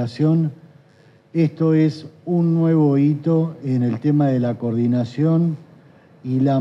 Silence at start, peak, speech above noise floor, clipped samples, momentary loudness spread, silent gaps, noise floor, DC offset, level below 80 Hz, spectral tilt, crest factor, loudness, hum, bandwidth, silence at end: 0 s; -6 dBFS; 34 dB; under 0.1%; 8 LU; none; -52 dBFS; under 0.1%; -68 dBFS; -10 dB/octave; 12 dB; -19 LUFS; none; 6 kHz; 0 s